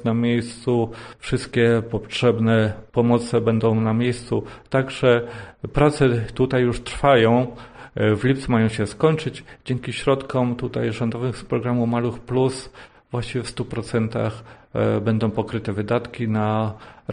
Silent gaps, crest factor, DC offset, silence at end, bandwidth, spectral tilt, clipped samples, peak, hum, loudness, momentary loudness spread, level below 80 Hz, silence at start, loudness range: none; 18 dB; under 0.1%; 0 s; 10 kHz; -7 dB/octave; under 0.1%; -4 dBFS; none; -22 LUFS; 10 LU; -44 dBFS; 0 s; 5 LU